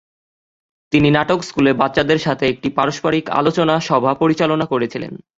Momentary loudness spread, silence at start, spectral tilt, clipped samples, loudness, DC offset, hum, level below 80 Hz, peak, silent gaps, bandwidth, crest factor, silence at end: 5 LU; 0.9 s; -6 dB/octave; under 0.1%; -17 LUFS; under 0.1%; none; -50 dBFS; 0 dBFS; none; 7.8 kHz; 18 dB; 0.2 s